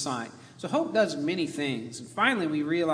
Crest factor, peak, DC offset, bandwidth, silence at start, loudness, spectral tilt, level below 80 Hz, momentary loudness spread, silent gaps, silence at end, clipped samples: 20 dB; -8 dBFS; under 0.1%; 11 kHz; 0 s; -28 LUFS; -4.5 dB/octave; -74 dBFS; 11 LU; none; 0 s; under 0.1%